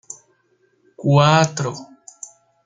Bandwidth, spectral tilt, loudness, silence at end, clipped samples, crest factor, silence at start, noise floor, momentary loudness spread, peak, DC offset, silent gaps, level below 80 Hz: 9.4 kHz; -5.5 dB/octave; -17 LUFS; 0.8 s; under 0.1%; 20 dB; 1 s; -62 dBFS; 25 LU; -2 dBFS; under 0.1%; none; -58 dBFS